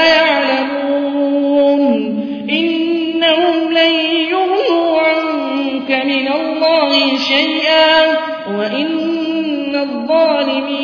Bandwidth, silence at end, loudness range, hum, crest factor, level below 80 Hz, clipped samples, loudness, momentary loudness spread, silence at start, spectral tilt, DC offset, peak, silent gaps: 5.4 kHz; 0 s; 1 LU; none; 14 dB; -56 dBFS; under 0.1%; -14 LUFS; 7 LU; 0 s; -4.5 dB/octave; under 0.1%; 0 dBFS; none